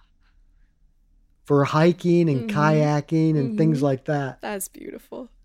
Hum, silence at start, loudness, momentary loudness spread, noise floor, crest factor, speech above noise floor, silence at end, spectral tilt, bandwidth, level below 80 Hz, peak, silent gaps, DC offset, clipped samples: none; 1.5 s; -21 LUFS; 15 LU; -59 dBFS; 16 dB; 38 dB; 0.2 s; -7 dB/octave; 15.5 kHz; -58 dBFS; -6 dBFS; none; under 0.1%; under 0.1%